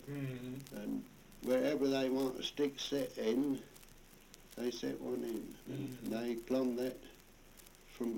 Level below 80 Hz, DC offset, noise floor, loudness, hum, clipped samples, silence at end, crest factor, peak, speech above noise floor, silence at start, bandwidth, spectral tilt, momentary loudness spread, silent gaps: -64 dBFS; under 0.1%; -59 dBFS; -38 LUFS; none; under 0.1%; 0 s; 18 dB; -22 dBFS; 22 dB; 0 s; 17 kHz; -5.5 dB/octave; 23 LU; none